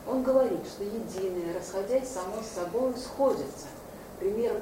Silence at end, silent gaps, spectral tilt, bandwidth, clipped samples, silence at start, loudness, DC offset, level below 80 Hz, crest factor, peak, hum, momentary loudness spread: 0 s; none; -5 dB/octave; 16 kHz; under 0.1%; 0 s; -30 LUFS; under 0.1%; -56 dBFS; 18 dB; -12 dBFS; none; 12 LU